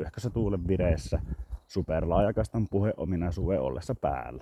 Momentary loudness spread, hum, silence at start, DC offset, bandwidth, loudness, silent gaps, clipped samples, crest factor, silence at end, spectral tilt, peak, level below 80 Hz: 8 LU; none; 0 s; under 0.1%; 13 kHz; -30 LUFS; none; under 0.1%; 18 dB; 0 s; -8 dB/octave; -12 dBFS; -38 dBFS